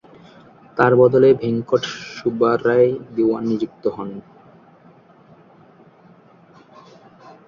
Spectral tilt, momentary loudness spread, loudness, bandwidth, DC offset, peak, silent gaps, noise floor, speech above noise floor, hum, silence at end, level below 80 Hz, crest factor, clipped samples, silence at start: -7 dB/octave; 16 LU; -18 LUFS; 7.4 kHz; under 0.1%; -2 dBFS; none; -49 dBFS; 32 dB; none; 3.25 s; -60 dBFS; 18 dB; under 0.1%; 0.75 s